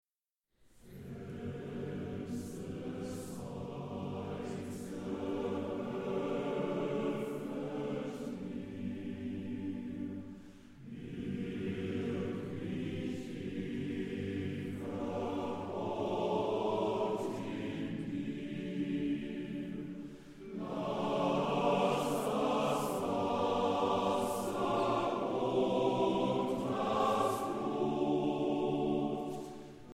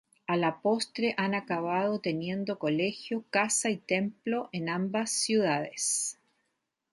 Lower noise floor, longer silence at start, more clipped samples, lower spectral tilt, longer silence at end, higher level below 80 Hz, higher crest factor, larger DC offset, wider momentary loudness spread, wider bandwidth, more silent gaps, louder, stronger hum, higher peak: first, under -90 dBFS vs -81 dBFS; first, 0.75 s vs 0.3 s; neither; first, -6.5 dB/octave vs -3.5 dB/octave; second, 0 s vs 0.8 s; first, -64 dBFS vs -76 dBFS; about the same, 18 dB vs 18 dB; neither; first, 11 LU vs 6 LU; first, 16 kHz vs 12 kHz; neither; second, -36 LUFS vs -30 LUFS; neither; second, -18 dBFS vs -12 dBFS